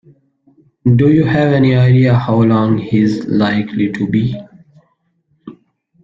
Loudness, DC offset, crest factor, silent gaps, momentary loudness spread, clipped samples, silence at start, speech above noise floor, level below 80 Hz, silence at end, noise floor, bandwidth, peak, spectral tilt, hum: -13 LUFS; under 0.1%; 12 dB; none; 7 LU; under 0.1%; 0.85 s; 50 dB; -46 dBFS; 0.55 s; -62 dBFS; 7 kHz; -2 dBFS; -9 dB/octave; none